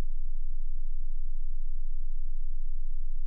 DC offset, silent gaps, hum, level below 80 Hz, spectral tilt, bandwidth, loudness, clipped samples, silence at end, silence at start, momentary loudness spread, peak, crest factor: under 0.1%; none; none; -26 dBFS; -19.5 dB/octave; 0.1 kHz; -40 LUFS; under 0.1%; 0 s; 0 s; 0 LU; -20 dBFS; 4 dB